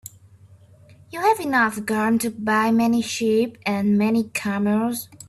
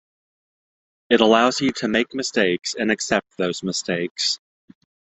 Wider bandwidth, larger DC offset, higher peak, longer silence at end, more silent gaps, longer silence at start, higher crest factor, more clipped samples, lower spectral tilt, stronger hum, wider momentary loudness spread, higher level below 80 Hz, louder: first, 13.5 kHz vs 8.4 kHz; neither; second, -8 dBFS vs 0 dBFS; second, 0.05 s vs 0.8 s; second, none vs 4.11-4.15 s; second, 0.05 s vs 1.1 s; second, 14 dB vs 22 dB; neither; first, -5 dB/octave vs -3.5 dB/octave; neither; second, 5 LU vs 9 LU; about the same, -62 dBFS vs -60 dBFS; about the same, -21 LUFS vs -21 LUFS